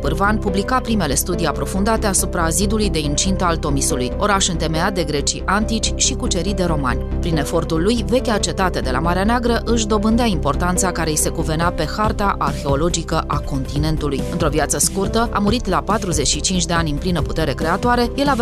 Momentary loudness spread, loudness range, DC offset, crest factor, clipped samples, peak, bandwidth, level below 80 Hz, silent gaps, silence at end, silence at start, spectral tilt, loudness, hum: 4 LU; 1 LU; under 0.1%; 14 dB; under 0.1%; -4 dBFS; 14 kHz; -26 dBFS; none; 0 s; 0 s; -4 dB/octave; -18 LUFS; none